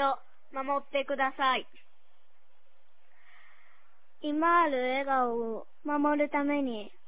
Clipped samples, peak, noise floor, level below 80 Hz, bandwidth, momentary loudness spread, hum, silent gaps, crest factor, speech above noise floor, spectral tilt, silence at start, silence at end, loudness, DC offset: under 0.1%; -14 dBFS; -72 dBFS; -70 dBFS; 4 kHz; 13 LU; none; none; 18 dB; 42 dB; -1 dB/octave; 0 s; 0.2 s; -30 LUFS; 0.8%